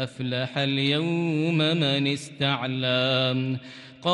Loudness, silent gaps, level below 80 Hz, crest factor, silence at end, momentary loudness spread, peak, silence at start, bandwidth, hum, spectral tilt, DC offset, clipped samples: -25 LUFS; none; -68 dBFS; 16 dB; 0 s; 7 LU; -8 dBFS; 0 s; 11.5 kHz; none; -6 dB/octave; under 0.1%; under 0.1%